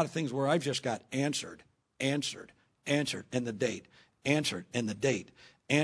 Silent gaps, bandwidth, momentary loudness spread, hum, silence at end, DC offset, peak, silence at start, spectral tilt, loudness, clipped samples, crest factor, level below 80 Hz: none; 11 kHz; 9 LU; none; 0 s; under 0.1%; -12 dBFS; 0 s; -4.5 dB/octave; -33 LUFS; under 0.1%; 22 dB; -72 dBFS